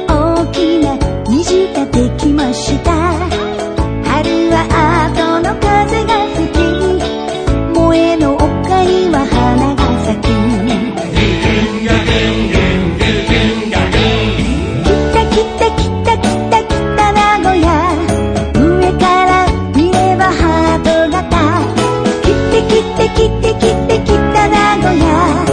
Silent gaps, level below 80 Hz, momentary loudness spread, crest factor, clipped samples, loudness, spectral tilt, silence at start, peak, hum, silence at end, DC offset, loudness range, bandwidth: none; -22 dBFS; 4 LU; 12 dB; under 0.1%; -12 LUFS; -6 dB/octave; 0 s; 0 dBFS; none; 0 s; under 0.1%; 2 LU; 10 kHz